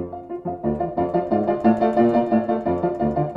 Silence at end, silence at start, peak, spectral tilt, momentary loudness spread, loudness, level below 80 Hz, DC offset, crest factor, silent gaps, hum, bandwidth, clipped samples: 0 s; 0 s; -4 dBFS; -10 dB/octave; 9 LU; -21 LUFS; -48 dBFS; under 0.1%; 16 dB; none; none; 5.2 kHz; under 0.1%